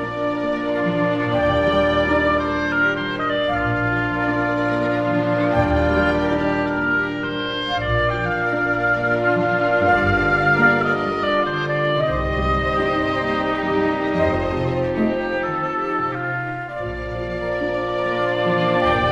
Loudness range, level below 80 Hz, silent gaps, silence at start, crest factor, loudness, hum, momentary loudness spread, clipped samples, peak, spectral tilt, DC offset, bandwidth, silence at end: 4 LU; -36 dBFS; none; 0 s; 16 dB; -20 LUFS; none; 6 LU; under 0.1%; -4 dBFS; -7 dB/octave; under 0.1%; 8.6 kHz; 0 s